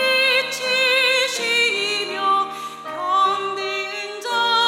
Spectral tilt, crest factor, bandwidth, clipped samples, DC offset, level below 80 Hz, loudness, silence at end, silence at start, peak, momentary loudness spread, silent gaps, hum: 0 dB/octave; 14 dB; 17.5 kHz; under 0.1%; under 0.1%; -80 dBFS; -19 LUFS; 0 s; 0 s; -6 dBFS; 12 LU; none; none